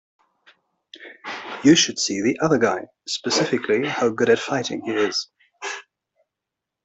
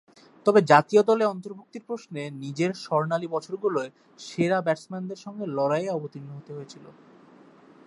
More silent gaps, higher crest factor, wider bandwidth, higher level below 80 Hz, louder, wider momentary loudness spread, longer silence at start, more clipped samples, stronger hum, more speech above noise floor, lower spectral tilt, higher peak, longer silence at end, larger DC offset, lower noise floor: neither; about the same, 20 dB vs 24 dB; second, 8.4 kHz vs 11 kHz; first, -64 dBFS vs -74 dBFS; first, -21 LUFS vs -25 LUFS; second, 18 LU vs 21 LU; first, 1 s vs 0.45 s; neither; neither; first, 63 dB vs 27 dB; second, -3.5 dB/octave vs -6 dB/octave; about the same, -4 dBFS vs -2 dBFS; about the same, 1.05 s vs 0.95 s; neither; first, -84 dBFS vs -53 dBFS